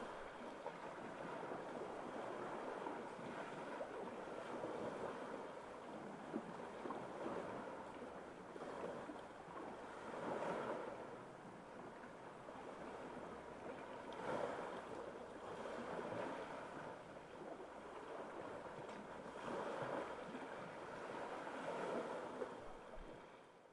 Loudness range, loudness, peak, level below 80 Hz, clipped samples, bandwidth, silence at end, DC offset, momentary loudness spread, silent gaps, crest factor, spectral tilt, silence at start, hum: 2 LU; -50 LUFS; -30 dBFS; -74 dBFS; under 0.1%; 11 kHz; 0 s; under 0.1%; 9 LU; none; 20 dB; -5.5 dB/octave; 0 s; none